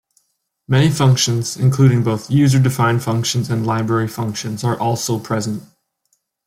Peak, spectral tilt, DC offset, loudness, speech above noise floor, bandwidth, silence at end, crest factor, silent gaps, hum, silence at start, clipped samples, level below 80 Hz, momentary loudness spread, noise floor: -2 dBFS; -5.5 dB/octave; under 0.1%; -17 LUFS; 53 dB; 15.5 kHz; 0.85 s; 16 dB; none; none; 0.7 s; under 0.1%; -52 dBFS; 8 LU; -69 dBFS